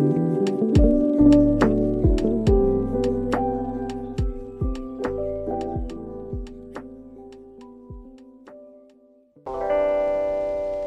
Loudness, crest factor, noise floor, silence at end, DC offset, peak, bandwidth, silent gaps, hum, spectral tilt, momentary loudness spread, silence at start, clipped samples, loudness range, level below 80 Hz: -22 LUFS; 18 dB; -55 dBFS; 0 s; under 0.1%; -4 dBFS; 9.2 kHz; none; none; -8.5 dB/octave; 23 LU; 0 s; under 0.1%; 19 LU; -32 dBFS